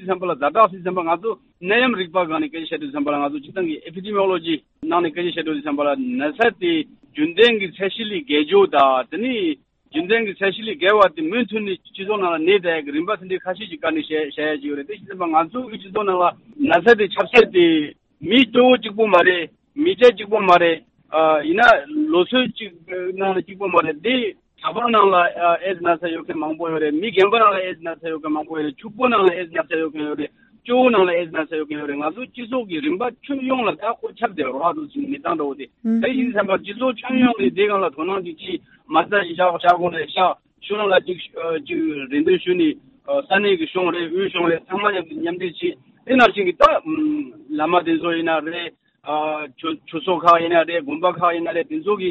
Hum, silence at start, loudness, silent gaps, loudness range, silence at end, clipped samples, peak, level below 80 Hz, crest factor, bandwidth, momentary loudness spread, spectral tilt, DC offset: none; 0 s; -19 LUFS; none; 6 LU; 0 s; under 0.1%; -2 dBFS; -58 dBFS; 18 dB; 8 kHz; 13 LU; -2 dB/octave; under 0.1%